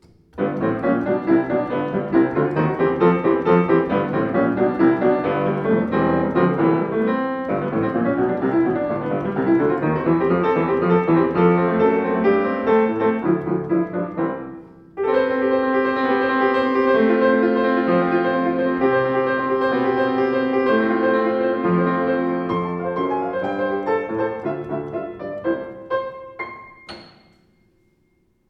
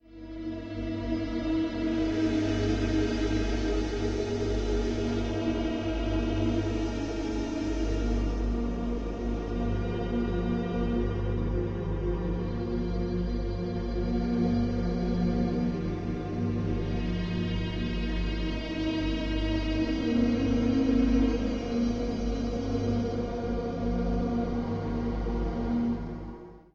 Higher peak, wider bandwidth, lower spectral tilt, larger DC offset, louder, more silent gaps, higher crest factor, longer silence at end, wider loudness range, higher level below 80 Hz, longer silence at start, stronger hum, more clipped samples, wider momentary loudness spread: first, -2 dBFS vs -14 dBFS; second, 5.6 kHz vs 7.6 kHz; first, -9.5 dB/octave vs -7.5 dB/octave; neither; first, -20 LUFS vs -30 LUFS; neither; about the same, 18 dB vs 14 dB; first, 1.45 s vs 0.15 s; about the same, 6 LU vs 4 LU; second, -52 dBFS vs -34 dBFS; first, 0.35 s vs 0.05 s; neither; neither; first, 9 LU vs 5 LU